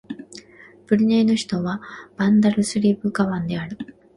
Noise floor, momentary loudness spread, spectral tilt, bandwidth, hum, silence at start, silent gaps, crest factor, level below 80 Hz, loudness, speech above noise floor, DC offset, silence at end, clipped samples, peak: -48 dBFS; 19 LU; -6 dB/octave; 11.5 kHz; none; 0.1 s; none; 16 dB; -58 dBFS; -20 LUFS; 28 dB; under 0.1%; 0.25 s; under 0.1%; -4 dBFS